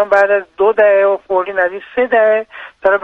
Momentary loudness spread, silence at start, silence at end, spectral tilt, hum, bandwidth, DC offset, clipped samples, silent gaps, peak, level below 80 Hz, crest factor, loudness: 8 LU; 0 s; 0.05 s; -5.5 dB/octave; none; 6.2 kHz; under 0.1%; under 0.1%; none; 0 dBFS; -56 dBFS; 14 dB; -13 LUFS